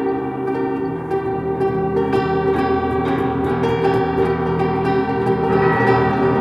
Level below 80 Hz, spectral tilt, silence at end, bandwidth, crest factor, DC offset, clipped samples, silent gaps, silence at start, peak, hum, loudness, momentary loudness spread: -44 dBFS; -8.5 dB/octave; 0 s; 6.2 kHz; 16 dB; under 0.1%; under 0.1%; none; 0 s; -2 dBFS; none; -18 LUFS; 6 LU